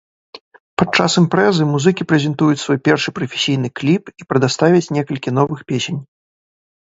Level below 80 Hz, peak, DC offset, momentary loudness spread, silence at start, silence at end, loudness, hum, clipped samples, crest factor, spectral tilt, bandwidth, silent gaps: -54 dBFS; 0 dBFS; under 0.1%; 8 LU; 0.35 s; 0.8 s; -16 LUFS; none; under 0.1%; 16 dB; -5.5 dB/octave; 8 kHz; 0.41-0.51 s, 0.60-0.77 s